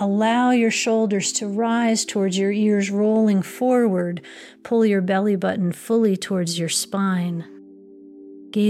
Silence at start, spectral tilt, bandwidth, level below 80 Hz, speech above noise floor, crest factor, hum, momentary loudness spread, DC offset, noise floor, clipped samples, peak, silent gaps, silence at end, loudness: 0 s; -5 dB/octave; 15 kHz; -72 dBFS; 24 dB; 12 dB; none; 8 LU; under 0.1%; -44 dBFS; under 0.1%; -8 dBFS; none; 0 s; -20 LUFS